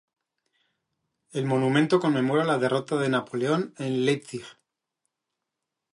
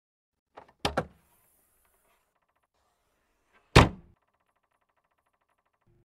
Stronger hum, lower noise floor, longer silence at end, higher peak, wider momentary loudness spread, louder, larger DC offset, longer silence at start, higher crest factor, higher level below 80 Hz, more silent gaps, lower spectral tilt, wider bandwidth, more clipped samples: neither; first, -85 dBFS vs -76 dBFS; second, 1.4 s vs 2.15 s; second, -8 dBFS vs -4 dBFS; second, 9 LU vs 14 LU; about the same, -25 LUFS vs -25 LUFS; neither; first, 1.35 s vs 0.85 s; second, 20 dB vs 28 dB; second, -74 dBFS vs -42 dBFS; neither; about the same, -6.5 dB/octave vs -5.5 dB/octave; second, 11.5 kHz vs 16 kHz; neither